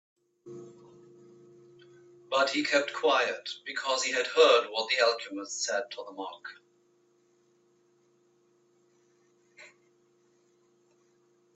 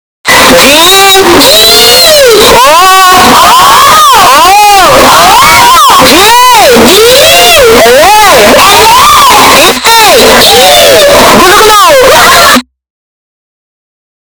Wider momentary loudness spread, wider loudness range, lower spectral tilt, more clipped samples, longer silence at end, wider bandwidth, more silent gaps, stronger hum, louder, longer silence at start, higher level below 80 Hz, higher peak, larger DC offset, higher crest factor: first, 24 LU vs 1 LU; first, 13 LU vs 1 LU; about the same, -1 dB/octave vs -1.5 dB/octave; second, under 0.1% vs 30%; first, 1.9 s vs 1.65 s; second, 8.4 kHz vs over 20 kHz; neither; neither; second, -28 LUFS vs 0 LUFS; first, 0.45 s vs 0.25 s; second, -88 dBFS vs -26 dBFS; second, -10 dBFS vs 0 dBFS; neither; first, 24 dB vs 2 dB